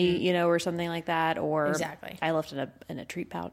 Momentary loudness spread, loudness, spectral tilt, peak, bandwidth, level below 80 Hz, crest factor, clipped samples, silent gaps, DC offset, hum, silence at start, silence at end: 12 LU; -29 LUFS; -5.5 dB/octave; -14 dBFS; 16 kHz; -62 dBFS; 16 dB; under 0.1%; none; under 0.1%; none; 0 s; 0.05 s